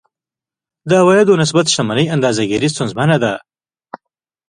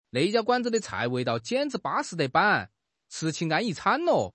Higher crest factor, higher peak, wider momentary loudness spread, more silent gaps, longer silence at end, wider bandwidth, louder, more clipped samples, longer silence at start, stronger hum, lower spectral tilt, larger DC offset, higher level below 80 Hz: about the same, 16 dB vs 18 dB; first, 0 dBFS vs -8 dBFS; about the same, 8 LU vs 7 LU; neither; first, 0.55 s vs 0.05 s; first, 11 kHz vs 8.8 kHz; first, -14 LUFS vs -26 LUFS; neither; first, 0.85 s vs 0.15 s; neither; about the same, -5 dB/octave vs -4.5 dB/octave; neither; first, -54 dBFS vs -68 dBFS